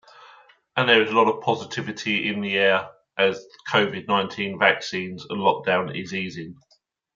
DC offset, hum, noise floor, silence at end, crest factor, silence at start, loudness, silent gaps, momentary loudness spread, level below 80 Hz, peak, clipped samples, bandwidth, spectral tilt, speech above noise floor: under 0.1%; none; -53 dBFS; 0.65 s; 22 dB; 0.75 s; -22 LUFS; none; 12 LU; -70 dBFS; -2 dBFS; under 0.1%; 7.6 kHz; -4.5 dB/octave; 30 dB